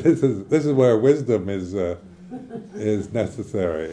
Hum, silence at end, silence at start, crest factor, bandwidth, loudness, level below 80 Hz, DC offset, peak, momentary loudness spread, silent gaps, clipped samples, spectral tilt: none; 0 s; 0 s; 16 dB; 10 kHz; -21 LUFS; -54 dBFS; under 0.1%; -6 dBFS; 19 LU; none; under 0.1%; -8 dB/octave